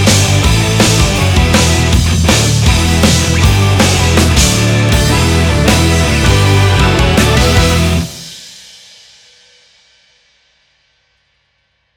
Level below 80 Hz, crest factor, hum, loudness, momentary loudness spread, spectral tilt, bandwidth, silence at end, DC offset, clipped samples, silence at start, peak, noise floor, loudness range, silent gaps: -18 dBFS; 10 dB; none; -10 LUFS; 2 LU; -4.5 dB/octave; 18 kHz; 3.45 s; under 0.1%; under 0.1%; 0 s; 0 dBFS; -61 dBFS; 6 LU; none